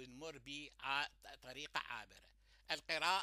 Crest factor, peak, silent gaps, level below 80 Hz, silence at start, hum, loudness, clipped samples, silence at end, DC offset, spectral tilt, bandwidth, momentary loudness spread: 24 dB; -22 dBFS; none; -72 dBFS; 0 s; none; -44 LUFS; under 0.1%; 0 s; under 0.1%; -1.5 dB/octave; 15.5 kHz; 14 LU